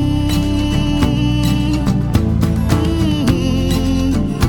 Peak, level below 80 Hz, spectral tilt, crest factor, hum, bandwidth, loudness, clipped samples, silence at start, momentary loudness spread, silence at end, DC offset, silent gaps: 0 dBFS; -22 dBFS; -6.5 dB/octave; 14 dB; none; 18.5 kHz; -16 LUFS; under 0.1%; 0 s; 1 LU; 0 s; 0.7%; none